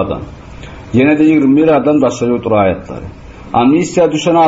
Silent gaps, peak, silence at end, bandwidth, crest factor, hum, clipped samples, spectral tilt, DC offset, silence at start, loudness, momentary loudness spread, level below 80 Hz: none; 0 dBFS; 0 s; 8 kHz; 12 dB; none; under 0.1%; -6.5 dB/octave; under 0.1%; 0 s; -11 LUFS; 22 LU; -38 dBFS